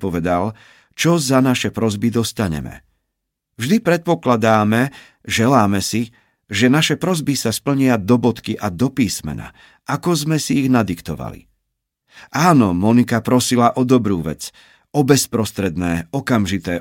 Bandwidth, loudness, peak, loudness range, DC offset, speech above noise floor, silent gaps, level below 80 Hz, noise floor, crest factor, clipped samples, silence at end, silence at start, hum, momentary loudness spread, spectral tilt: 17 kHz; -17 LUFS; -2 dBFS; 3 LU; under 0.1%; 60 dB; none; -48 dBFS; -77 dBFS; 16 dB; under 0.1%; 0 s; 0 s; none; 12 LU; -5 dB/octave